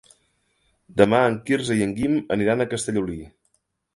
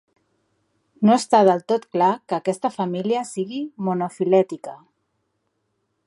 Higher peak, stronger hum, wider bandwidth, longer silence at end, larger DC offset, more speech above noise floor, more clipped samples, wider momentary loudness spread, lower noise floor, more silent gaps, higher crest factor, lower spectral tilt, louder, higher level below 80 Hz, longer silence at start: about the same, 0 dBFS vs -2 dBFS; neither; about the same, 11.5 kHz vs 11.5 kHz; second, 0.65 s vs 1.3 s; neither; second, 48 dB vs 53 dB; neither; about the same, 11 LU vs 12 LU; about the same, -70 dBFS vs -73 dBFS; neither; about the same, 22 dB vs 20 dB; about the same, -5.5 dB/octave vs -6 dB/octave; about the same, -22 LUFS vs -21 LUFS; first, -52 dBFS vs -74 dBFS; about the same, 0.95 s vs 1 s